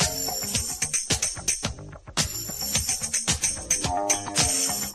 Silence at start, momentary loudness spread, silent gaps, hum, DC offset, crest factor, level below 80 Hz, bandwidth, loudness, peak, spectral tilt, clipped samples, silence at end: 0 s; 6 LU; none; none; under 0.1%; 20 dB; -42 dBFS; 13.5 kHz; -24 LUFS; -6 dBFS; -1.5 dB/octave; under 0.1%; 0 s